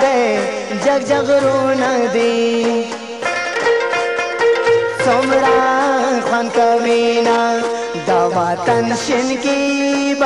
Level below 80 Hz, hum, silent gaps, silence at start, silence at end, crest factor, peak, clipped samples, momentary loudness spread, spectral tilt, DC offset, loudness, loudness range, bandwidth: -54 dBFS; none; none; 0 s; 0 s; 10 dB; -4 dBFS; under 0.1%; 5 LU; -4 dB/octave; 0.2%; -15 LUFS; 2 LU; 11.5 kHz